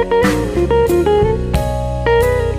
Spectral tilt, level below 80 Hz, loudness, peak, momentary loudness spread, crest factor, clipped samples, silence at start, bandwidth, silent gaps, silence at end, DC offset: -6.5 dB/octave; -24 dBFS; -15 LUFS; -4 dBFS; 5 LU; 10 dB; under 0.1%; 0 s; 15.5 kHz; none; 0 s; under 0.1%